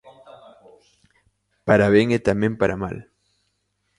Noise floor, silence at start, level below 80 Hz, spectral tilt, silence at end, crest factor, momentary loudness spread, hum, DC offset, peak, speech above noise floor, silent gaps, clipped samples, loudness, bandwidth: -72 dBFS; 0.05 s; -48 dBFS; -7 dB/octave; 0.95 s; 22 dB; 16 LU; 50 Hz at -40 dBFS; under 0.1%; 0 dBFS; 53 dB; none; under 0.1%; -20 LUFS; 11.5 kHz